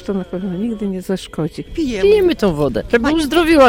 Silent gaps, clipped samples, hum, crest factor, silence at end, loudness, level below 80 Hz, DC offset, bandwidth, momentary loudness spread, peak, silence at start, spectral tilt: none; under 0.1%; none; 14 dB; 0 s; -17 LUFS; -34 dBFS; under 0.1%; 17 kHz; 11 LU; -2 dBFS; 0 s; -6 dB/octave